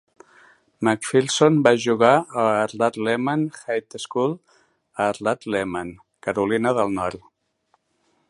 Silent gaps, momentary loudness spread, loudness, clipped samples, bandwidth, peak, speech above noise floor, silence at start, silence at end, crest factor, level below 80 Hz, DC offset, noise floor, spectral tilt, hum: none; 12 LU; -21 LUFS; under 0.1%; 11.5 kHz; 0 dBFS; 47 dB; 0.8 s; 1.1 s; 22 dB; -60 dBFS; under 0.1%; -68 dBFS; -5 dB/octave; none